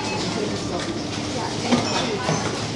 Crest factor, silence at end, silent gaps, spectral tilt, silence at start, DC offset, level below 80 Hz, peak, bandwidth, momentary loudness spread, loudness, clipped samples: 18 dB; 0 s; none; -4 dB/octave; 0 s; under 0.1%; -48 dBFS; -6 dBFS; 11.5 kHz; 6 LU; -24 LUFS; under 0.1%